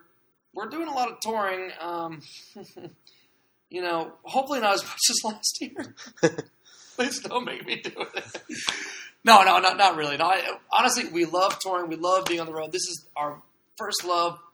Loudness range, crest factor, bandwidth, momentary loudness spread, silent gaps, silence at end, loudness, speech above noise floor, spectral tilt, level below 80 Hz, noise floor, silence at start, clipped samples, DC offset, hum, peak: 12 LU; 26 dB; over 20 kHz; 17 LU; none; 0.15 s; -24 LUFS; 41 dB; -2 dB/octave; -76 dBFS; -66 dBFS; 0.55 s; under 0.1%; under 0.1%; none; 0 dBFS